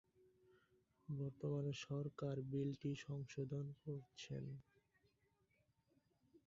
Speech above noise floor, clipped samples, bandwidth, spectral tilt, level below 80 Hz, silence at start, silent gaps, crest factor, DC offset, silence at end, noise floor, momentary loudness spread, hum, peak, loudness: 35 dB; under 0.1%; 7.4 kHz; -7.5 dB/octave; -78 dBFS; 1.1 s; none; 16 dB; under 0.1%; 0.1 s; -82 dBFS; 8 LU; none; -34 dBFS; -48 LUFS